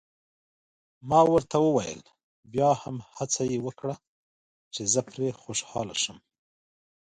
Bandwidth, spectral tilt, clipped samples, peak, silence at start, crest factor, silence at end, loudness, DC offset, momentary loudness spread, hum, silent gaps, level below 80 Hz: 11 kHz; -4 dB/octave; under 0.1%; -8 dBFS; 1.05 s; 22 dB; 0.9 s; -27 LUFS; under 0.1%; 16 LU; none; 2.24-2.43 s, 4.07-4.71 s; -60 dBFS